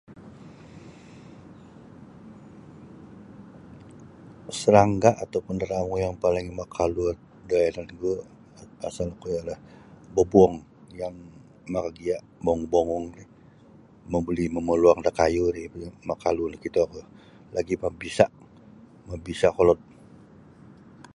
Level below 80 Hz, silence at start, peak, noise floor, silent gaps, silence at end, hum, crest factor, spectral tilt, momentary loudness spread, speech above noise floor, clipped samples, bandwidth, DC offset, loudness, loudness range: -48 dBFS; 0.1 s; -2 dBFS; -52 dBFS; none; 1.4 s; none; 24 dB; -6.5 dB/octave; 27 LU; 28 dB; under 0.1%; 11.5 kHz; under 0.1%; -25 LUFS; 5 LU